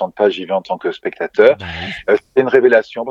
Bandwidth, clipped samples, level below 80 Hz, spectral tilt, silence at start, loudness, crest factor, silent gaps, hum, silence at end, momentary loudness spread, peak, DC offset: 7.2 kHz; under 0.1%; -50 dBFS; -6.5 dB/octave; 0 s; -15 LUFS; 16 dB; none; none; 0 s; 11 LU; 0 dBFS; under 0.1%